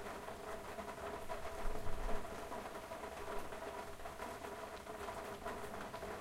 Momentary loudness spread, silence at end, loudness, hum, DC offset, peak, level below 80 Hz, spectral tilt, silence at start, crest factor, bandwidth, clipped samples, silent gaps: 2 LU; 0 s; -47 LUFS; none; under 0.1%; -24 dBFS; -50 dBFS; -4 dB/octave; 0 s; 18 dB; 16 kHz; under 0.1%; none